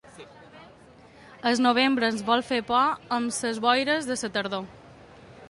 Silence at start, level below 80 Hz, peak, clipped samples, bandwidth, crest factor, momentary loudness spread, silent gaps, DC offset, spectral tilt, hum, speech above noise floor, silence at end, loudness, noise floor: 0.2 s; -62 dBFS; -6 dBFS; under 0.1%; 11.5 kHz; 20 dB; 8 LU; none; under 0.1%; -3 dB/octave; none; 27 dB; 0 s; -25 LUFS; -52 dBFS